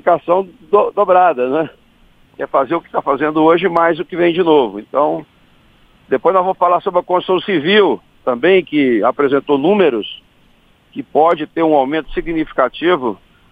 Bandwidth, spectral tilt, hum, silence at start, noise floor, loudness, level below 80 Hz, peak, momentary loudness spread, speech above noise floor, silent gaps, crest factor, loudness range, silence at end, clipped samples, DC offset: 5 kHz; -8 dB/octave; none; 0.05 s; -51 dBFS; -14 LUFS; -46 dBFS; 0 dBFS; 9 LU; 37 dB; none; 14 dB; 2 LU; 0.35 s; under 0.1%; under 0.1%